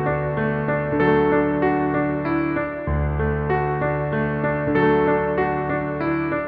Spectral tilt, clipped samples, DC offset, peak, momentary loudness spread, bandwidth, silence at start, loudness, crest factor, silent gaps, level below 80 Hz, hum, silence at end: -11 dB/octave; under 0.1%; under 0.1%; -6 dBFS; 6 LU; 4.8 kHz; 0 s; -21 LUFS; 16 dB; none; -36 dBFS; none; 0 s